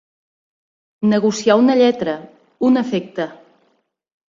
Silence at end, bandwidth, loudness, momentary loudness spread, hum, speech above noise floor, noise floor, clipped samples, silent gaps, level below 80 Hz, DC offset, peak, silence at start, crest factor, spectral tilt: 0.95 s; 7.6 kHz; -17 LUFS; 13 LU; none; 47 dB; -63 dBFS; under 0.1%; none; -64 dBFS; under 0.1%; -2 dBFS; 1 s; 16 dB; -5.5 dB/octave